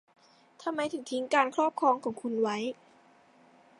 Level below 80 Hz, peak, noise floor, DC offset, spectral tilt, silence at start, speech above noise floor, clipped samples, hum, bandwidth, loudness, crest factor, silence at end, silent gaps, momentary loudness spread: -84 dBFS; -10 dBFS; -61 dBFS; under 0.1%; -4 dB/octave; 0.6 s; 31 dB; under 0.1%; none; 11.5 kHz; -30 LUFS; 22 dB; 1.05 s; none; 11 LU